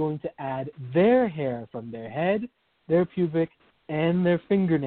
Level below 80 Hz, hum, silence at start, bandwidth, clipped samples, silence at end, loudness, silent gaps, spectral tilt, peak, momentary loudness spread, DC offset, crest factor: -62 dBFS; none; 0 s; 4.3 kHz; under 0.1%; 0 s; -26 LUFS; none; -12 dB/octave; -10 dBFS; 14 LU; under 0.1%; 16 dB